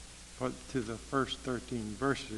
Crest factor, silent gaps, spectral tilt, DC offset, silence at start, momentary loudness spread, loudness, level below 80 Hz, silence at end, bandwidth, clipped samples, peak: 20 dB; none; -5 dB/octave; under 0.1%; 0 s; 6 LU; -36 LUFS; -54 dBFS; 0 s; 12 kHz; under 0.1%; -16 dBFS